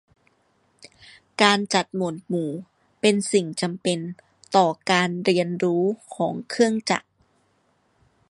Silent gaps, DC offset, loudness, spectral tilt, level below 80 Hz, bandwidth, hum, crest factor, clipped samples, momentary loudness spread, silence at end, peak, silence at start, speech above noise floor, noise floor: none; under 0.1%; -23 LUFS; -4.5 dB/octave; -70 dBFS; 11.5 kHz; none; 22 dB; under 0.1%; 9 LU; 1.3 s; -2 dBFS; 1.4 s; 44 dB; -66 dBFS